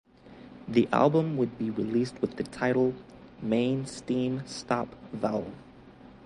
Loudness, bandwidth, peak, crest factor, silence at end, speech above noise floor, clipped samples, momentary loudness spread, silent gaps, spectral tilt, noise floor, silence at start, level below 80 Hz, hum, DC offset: -29 LUFS; 11.5 kHz; -8 dBFS; 20 dB; 0 s; 23 dB; under 0.1%; 15 LU; none; -6.5 dB/octave; -51 dBFS; 0.25 s; -60 dBFS; none; under 0.1%